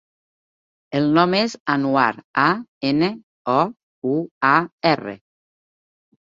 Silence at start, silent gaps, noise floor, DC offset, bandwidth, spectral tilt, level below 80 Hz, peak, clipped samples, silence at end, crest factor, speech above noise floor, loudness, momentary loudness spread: 0.9 s; 1.60-1.66 s, 2.24-2.34 s, 2.68-2.81 s, 3.23-3.45 s, 3.83-4.02 s, 4.31-4.41 s, 4.72-4.78 s; under -90 dBFS; under 0.1%; 7.6 kHz; -6 dB/octave; -64 dBFS; -2 dBFS; under 0.1%; 1.15 s; 20 dB; over 71 dB; -20 LUFS; 8 LU